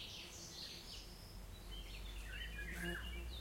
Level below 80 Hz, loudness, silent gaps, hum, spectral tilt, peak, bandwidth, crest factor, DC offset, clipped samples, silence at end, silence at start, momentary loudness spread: -52 dBFS; -49 LUFS; none; none; -3 dB/octave; -32 dBFS; 16.5 kHz; 18 dB; under 0.1%; under 0.1%; 0 s; 0 s; 10 LU